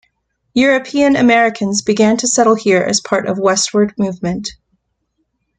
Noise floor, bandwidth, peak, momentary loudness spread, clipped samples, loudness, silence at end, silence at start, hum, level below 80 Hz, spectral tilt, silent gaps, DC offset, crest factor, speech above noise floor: -68 dBFS; 9.6 kHz; 0 dBFS; 9 LU; under 0.1%; -14 LUFS; 1.05 s; 0.55 s; none; -50 dBFS; -3.5 dB/octave; none; under 0.1%; 14 dB; 55 dB